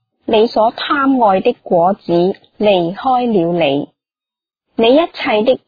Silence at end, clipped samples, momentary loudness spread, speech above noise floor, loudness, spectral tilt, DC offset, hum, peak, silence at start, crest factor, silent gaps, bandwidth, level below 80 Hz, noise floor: 0.1 s; under 0.1%; 5 LU; 76 dB; -14 LUFS; -8 dB/octave; under 0.1%; none; 0 dBFS; 0.3 s; 14 dB; none; 5 kHz; -52 dBFS; -89 dBFS